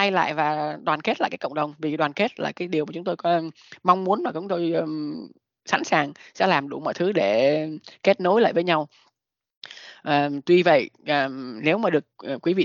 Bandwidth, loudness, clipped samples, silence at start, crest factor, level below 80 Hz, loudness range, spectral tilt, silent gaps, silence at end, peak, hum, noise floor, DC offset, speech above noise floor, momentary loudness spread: 7.4 kHz; -23 LUFS; under 0.1%; 0 s; 22 dB; -74 dBFS; 3 LU; -5.5 dB/octave; 9.57-9.62 s; 0 s; -2 dBFS; none; -72 dBFS; under 0.1%; 49 dB; 11 LU